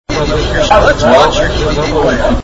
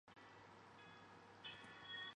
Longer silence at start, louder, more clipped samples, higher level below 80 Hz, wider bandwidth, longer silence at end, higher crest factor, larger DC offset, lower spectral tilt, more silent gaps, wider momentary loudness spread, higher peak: about the same, 0.1 s vs 0.05 s; first, -10 LUFS vs -58 LUFS; first, 0.5% vs under 0.1%; first, -20 dBFS vs -86 dBFS; second, 8 kHz vs 10 kHz; about the same, 0.05 s vs 0 s; second, 10 dB vs 16 dB; neither; first, -5 dB/octave vs -3.5 dB/octave; neither; second, 6 LU vs 10 LU; first, 0 dBFS vs -42 dBFS